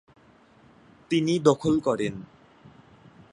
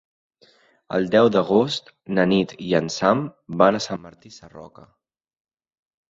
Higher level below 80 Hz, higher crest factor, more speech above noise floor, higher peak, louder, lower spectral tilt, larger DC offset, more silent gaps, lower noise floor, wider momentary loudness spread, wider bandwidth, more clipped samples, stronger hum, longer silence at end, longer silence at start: about the same, -60 dBFS vs -60 dBFS; about the same, 24 dB vs 20 dB; about the same, 33 dB vs 36 dB; about the same, -4 dBFS vs -2 dBFS; second, -24 LUFS vs -21 LUFS; about the same, -6 dB/octave vs -5.5 dB/octave; neither; neither; about the same, -56 dBFS vs -58 dBFS; second, 10 LU vs 13 LU; first, 10.5 kHz vs 7.8 kHz; neither; neither; second, 1.1 s vs 1.45 s; first, 1.1 s vs 0.9 s